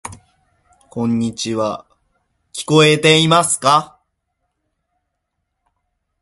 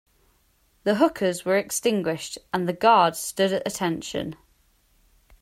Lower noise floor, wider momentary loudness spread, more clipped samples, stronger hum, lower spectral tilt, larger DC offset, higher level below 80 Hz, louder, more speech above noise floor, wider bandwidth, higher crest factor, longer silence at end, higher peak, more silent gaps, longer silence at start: first, -74 dBFS vs -64 dBFS; first, 21 LU vs 12 LU; neither; neither; about the same, -4 dB/octave vs -4 dB/octave; neither; first, -54 dBFS vs -60 dBFS; first, -14 LUFS vs -24 LUFS; first, 60 dB vs 41 dB; second, 12 kHz vs 16 kHz; about the same, 18 dB vs 20 dB; first, 2.35 s vs 1.05 s; first, 0 dBFS vs -4 dBFS; neither; second, 0.05 s vs 0.85 s